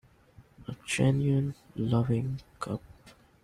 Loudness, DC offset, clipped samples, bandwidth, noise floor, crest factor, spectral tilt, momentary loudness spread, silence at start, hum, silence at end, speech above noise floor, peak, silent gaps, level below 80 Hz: -30 LUFS; under 0.1%; under 0.1%; 12.5 kHz; -58 dBFS; 16 dB; -6.5 dB/octave; 15 LU; 0.4 s; none; 0.35 s; 30 dB; -14 dBFS; none; -56 dBFS